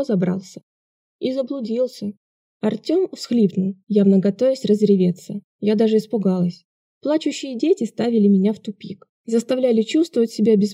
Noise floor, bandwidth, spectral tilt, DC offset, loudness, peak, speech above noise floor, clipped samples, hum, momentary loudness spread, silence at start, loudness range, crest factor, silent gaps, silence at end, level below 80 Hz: under -90 dBFS; 11.5 kHz; -7.5 dB/octave; under 0.1%; -20 LUFS; -4 dBFS; over 71 dB; under 0.1%; none; 13 LU; 0 s; 5 LU; 14 dB; 0.63-1.19 s, 2.17-2.60 s, 5.44-5.59 s, 6.65-7.01 s, 9.09-9.24 s; 0 s; -74 dBFS